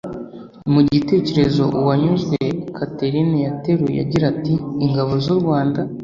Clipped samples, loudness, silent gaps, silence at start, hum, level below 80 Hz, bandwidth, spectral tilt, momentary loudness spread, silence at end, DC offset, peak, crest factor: under 0.1%; -18 LUFS; none; 0.05 s; none; -46 dBFS; 7.4 kHz; -8.5 dB/octave; 8 LU; 0 s; under 0.1%; -2 dBFS; 16 dB